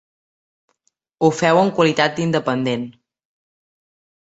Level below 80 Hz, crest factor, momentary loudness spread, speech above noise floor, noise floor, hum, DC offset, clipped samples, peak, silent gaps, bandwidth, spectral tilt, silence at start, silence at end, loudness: -62 dBFS; 20 dB; 9 LU; 52 dB; -69 dBFS; none; under 0.1%; under 0.1%; -2 dBFS; none; 8.2 kHz; -5.5 dB/octave; 1.2 s; 1.3 s; -18 LUFS